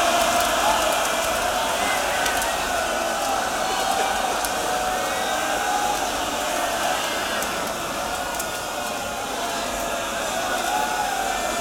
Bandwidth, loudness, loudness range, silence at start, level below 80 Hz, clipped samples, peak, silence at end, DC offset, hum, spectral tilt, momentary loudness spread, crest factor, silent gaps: 19.5 kHz; -23 LUFS; 4 LU; 0 s; -46 dBFS; under 0.1%; -6 dBFS; 0 s; under 0.1%; none; -1.5 dB/octave; 6 LU; 18 dB; none